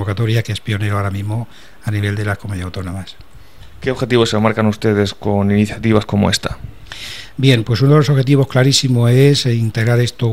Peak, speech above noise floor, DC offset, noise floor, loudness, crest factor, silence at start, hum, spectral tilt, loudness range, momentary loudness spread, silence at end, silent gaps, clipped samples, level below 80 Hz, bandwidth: 0 dBFS; 26 dB; 1%; -40 dBFS; -15 LUFS; 16 dB; 0 s; none; -6 dB/octave; 8 LU; 15 LU; 0 s; none; under 0.1%; -42 dBFS; 15.5 kHz